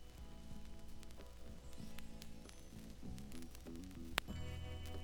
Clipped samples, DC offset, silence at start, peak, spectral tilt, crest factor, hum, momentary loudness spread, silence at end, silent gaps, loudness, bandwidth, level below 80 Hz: under 0.1%; under 0.1%; 0 s; -12 dBFS; -4.5 dB/octave; 36 dB; none; 14 LU; 0 s; none; -52 LUFS; over 20 kHz; -56 dBFS